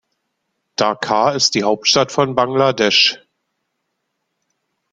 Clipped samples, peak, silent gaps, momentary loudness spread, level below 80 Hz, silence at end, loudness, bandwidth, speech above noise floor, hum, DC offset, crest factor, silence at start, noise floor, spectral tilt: under 0.1%; 0 dBFS; none; 7 LU; -58 dBFS; 1.75 s; -15 LUFS; 11 kHz; 58 dB; none; under 0.1%; 18 dB; 0.8 s; -73 dBFS; -3 dB/octave